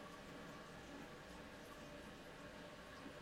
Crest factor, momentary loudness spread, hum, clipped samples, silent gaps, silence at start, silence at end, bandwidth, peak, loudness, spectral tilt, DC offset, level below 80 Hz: 14 dB; 1 LU; none; under 0.1%; none; 0 s; 0 s; 16 kHz; -42 dBFS; -55 LUFS; -4.5 dB/octave; under 0.1%; -68 dBFS